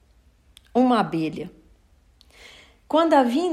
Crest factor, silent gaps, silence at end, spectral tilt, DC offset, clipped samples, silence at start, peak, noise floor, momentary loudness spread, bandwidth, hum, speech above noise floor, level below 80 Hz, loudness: 18 dB; none; 0 s; -6 dB/octave; under 0.1%; under 0.1%; 0.75 s; -6 dBFS; -57 dBFS; 14 LU; 13 kHz; none; 37 dB; -58 dBFS; -21 LUFS